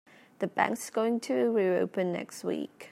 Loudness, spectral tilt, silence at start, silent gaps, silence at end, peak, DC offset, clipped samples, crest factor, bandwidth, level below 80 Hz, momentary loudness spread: -30 LUFS; -5.5 dB/octave; 0.4 s; none; 0 s; -10 dBFS; under 0.1%; under 0.1%; 20 dB; 16 kHz; -80 dBFS; 8 LU